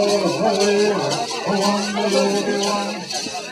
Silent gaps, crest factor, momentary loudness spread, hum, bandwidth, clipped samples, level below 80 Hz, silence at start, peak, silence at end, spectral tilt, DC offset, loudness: none; 16 dB; 7 LU; none; 14.5 kHz; under 0.1%; -62 dBFS; 0 s; -4 dBFS; 0 s; -3.5 dB/octave; under 0.1%; -19 LUFS